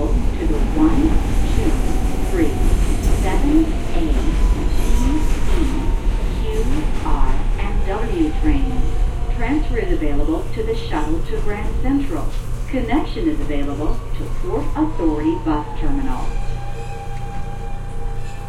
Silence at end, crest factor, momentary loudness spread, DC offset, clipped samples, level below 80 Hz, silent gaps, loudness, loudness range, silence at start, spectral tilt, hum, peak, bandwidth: 0 s; 14 dB; 10 LU; under 0.1%; under 0.1%; -18 dBFS; none; -22 LUFS; 3 LU; 0 s; -7 dB/octave; none; -2 dBFS; 12.5 kHz